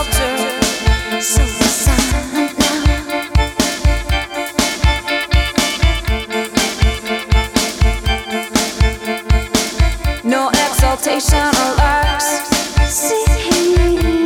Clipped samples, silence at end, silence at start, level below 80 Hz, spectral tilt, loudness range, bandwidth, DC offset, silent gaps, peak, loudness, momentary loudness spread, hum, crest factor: under 0.1%; 0 s; 0 s; -18 dBFS; -4 dB/octave; 2 LU; 18.5 kHz; under 0.1%; none; -2 dBFS; -15 LUFS; 5 LU; none; 14 dB